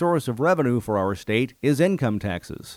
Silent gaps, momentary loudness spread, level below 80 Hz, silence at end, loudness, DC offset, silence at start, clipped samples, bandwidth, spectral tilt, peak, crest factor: none; 7 LU; -54 dBFS; 0 s; -23 LUFS; under 0.1%; 0 s; under 0.1%; 16.5 kHz; -6.5 dB/octave; -6 dBFS; 16 dB